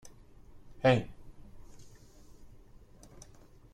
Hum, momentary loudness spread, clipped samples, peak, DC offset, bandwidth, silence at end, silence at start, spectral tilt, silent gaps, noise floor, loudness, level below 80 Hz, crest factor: none; 28 LU; under 0.1%; -10 dBFS; under 0.1%; 11.5 kHz; 0.5 s; 0.05 s; -6.5 dB/octave; none; -56 dBFS; -29 LUFS; -56 dBFS; 26 dB